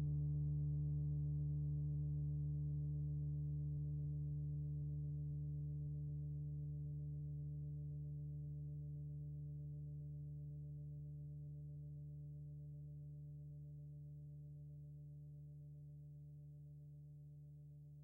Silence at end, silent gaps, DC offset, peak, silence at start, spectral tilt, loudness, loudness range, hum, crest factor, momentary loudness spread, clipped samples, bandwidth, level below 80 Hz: 0 s; none; under 0.1%; -36 dBFS; 0 s; -13 dB/octave; -47 LUFS; 13 LU; none; 10 dB; 15 LU; under 0.1%; 0.8 kHz; -56 dBFS